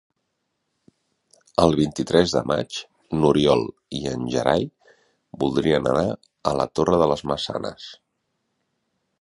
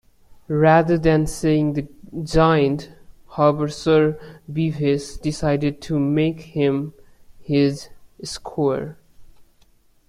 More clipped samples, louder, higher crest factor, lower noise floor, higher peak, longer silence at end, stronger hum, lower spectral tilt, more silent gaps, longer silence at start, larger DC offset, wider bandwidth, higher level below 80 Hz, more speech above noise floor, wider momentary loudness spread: neither; about the same, -22 LUFS vs -20 LUFS; about the same, 22 dB vs 18 dB; first, -76 dBFS vs -55 dBFS; about the same, -2 dBFS vs -2 dBFS; first, 1.25 s vs 0.65 s; neither; about the same, -6 dB/octave vs -7 dB/octave; neither; first, 1.6 s vs 0.5 s; neither; about the same, 11.5 kHz vs 12.5 kHz; second, -48 dBFS vs -42 dBFS; first, 55 dB vs 36 dB; second, 12 LU vs 16 LU